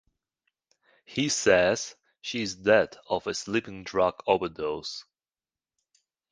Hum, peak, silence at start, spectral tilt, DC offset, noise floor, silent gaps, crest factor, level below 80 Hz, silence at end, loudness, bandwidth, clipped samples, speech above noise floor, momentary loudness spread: none; -6 dBFS; 1.1 s; -3.5 dB/octave; under 0.1%; under -90 dBFS; none; 22 dB; -60 dBFS; 1.3 s; -27 LUFS; 10 kHz; under 0.1%; over 63 dB; 13 LU